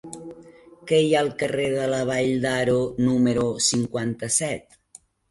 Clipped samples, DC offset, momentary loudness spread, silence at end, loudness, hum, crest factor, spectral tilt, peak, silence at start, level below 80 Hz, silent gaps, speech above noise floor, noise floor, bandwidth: under 0.1%; under 0.1%; 13 LU; 0.7 s; -22 LUFS; none; 16 dB; -4 dB/octave; -8 dBFS; 0.05 s; -56 dBFS; none; 30 dB; -53 dBFS; 11.5 kHz